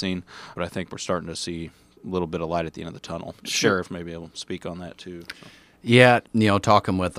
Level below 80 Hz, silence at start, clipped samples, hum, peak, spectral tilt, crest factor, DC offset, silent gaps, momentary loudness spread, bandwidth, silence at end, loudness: -54 dBFS; 0 s; under 0.1%; none; -2 dBFS; -5 dB/octave; 22 dB; under 0.1%; none; 21 LU; 15.5 kHz; 0 s; -23 LUFS